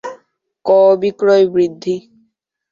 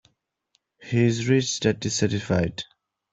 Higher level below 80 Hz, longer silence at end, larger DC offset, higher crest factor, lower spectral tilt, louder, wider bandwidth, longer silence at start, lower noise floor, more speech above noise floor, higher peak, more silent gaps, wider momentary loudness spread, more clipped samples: second, -60 dBFS vs -54 dBFS; first, 0.75 s vs 0.5 s; neither; second, 14 dB vs 20 dB; first, -6.5 dB/octave vs -5 dB/octave; first, -14 LUFS vs -24 LUFS; second, 7.4 kHz vs 8.2 kHz; second, 0.05 s vs 0.8 s; second, -63 dBFS vs -71 dBFS; about the same, 50 dB vs 49 dB; first, -2 dBFS vs -6 dBFS; neither; first, 14 LU vs 8 LU; neither